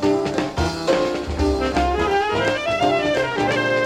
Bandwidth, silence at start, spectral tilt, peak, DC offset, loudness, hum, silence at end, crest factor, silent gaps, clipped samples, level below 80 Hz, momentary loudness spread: 15 kHz; 0 s; -5 dB/octave; -6 dBFS; under 0.1%; -20 LUFS; none; 0 s; 14 dB; none; under 0.1%; -32 dBFS; 4 LU